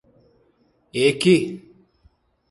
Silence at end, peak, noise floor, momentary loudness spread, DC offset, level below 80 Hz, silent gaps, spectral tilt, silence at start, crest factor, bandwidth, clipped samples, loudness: 0.95 s; -4 dBFS; -62 dBFS; 16 LU; under 0.1%; -60 dBFS; none; -5.5 dB/octave; 0.95 s; 20 dB; 11.5 kHz; under 0.1%; -20 LUFS